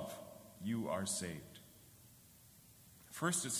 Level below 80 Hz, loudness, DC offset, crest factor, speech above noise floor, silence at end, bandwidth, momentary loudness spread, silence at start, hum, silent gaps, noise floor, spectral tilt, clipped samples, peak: -70 dBFS; -41 LUFS; under 0.1%; 20 dB; 24 dB; 0 s; 16 kHz; 23 LU; 0 s; none; none; -63 dBFS; -3.5 dB/octave; under 0.1%; -22 dBFS